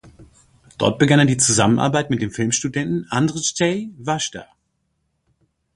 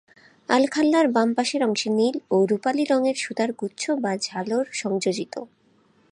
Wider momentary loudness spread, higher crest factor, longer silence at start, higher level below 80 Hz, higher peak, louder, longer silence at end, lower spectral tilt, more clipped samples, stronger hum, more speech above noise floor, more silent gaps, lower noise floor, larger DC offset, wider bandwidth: about the same, 9 LU vs 8 LU; about the same, 20 dB vs 18 dB; second, 0.05 s vs 0.5 s; first, -52 dBFS vs -72 dBFS; first, 0 dBFS vs -6 dBFS; first, -19 LUFS vs -23 LUFS; first, 1.3 s vs 0.65 s; about the same, -4 dB/octave vs -4.5 dB/octave; neither; neither; first, 52 dB vs 38 dB; neither; first, -70 dBFS vs -61 dBFS; neither; about the same, 11.5 kHz vs 11 kHz